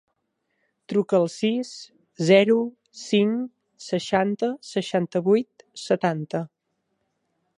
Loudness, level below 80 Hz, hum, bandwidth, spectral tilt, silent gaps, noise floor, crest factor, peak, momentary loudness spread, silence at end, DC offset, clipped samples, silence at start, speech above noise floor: -23 LUFS; -70 dBFS; none; 11 kHz; -6 dB/octave; none; -75 dBFS; 20 dB; -4 dBFS; 18 LU; 1.1 s; under 0.1%; under 0.1%; 0.9 s; 53 dB